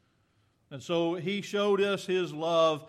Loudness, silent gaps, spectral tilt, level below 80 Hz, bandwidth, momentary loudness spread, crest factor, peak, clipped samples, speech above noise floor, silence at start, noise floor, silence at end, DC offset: -29 LUFS; none; -5 dB/octave; -80 dBFS; 13.5 kHz; 7 LU; 18 dB; -12 dBFS; under 0.1%; 42 dB; 0.7 s; -70 dBFS; 0 s; under 0.1%